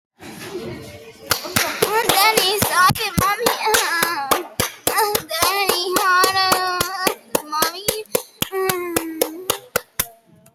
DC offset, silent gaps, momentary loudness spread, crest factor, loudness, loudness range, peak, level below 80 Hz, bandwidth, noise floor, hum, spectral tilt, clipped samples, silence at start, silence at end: under 0.1%; none; 12 LU; 16 dB; -18 LUFS; 5 LU; -4 dBFS; -48 dBFS; over 20 kHz; -46 dBFS; none; -2 dB/octave; under 0.1%; 0.2 s; 0.45 s